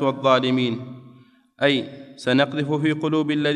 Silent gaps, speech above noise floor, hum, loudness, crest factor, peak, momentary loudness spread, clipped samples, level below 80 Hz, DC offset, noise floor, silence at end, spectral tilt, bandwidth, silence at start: none; 31 dB; none; -21 LUFS; 18 dB; -4 dBFS; 12 LU; under 0.1%; -70 dBFS; under 0.1%; -52 dBFS; 0 s; -6.5 dB/octave; 10.5 kHz; 0 s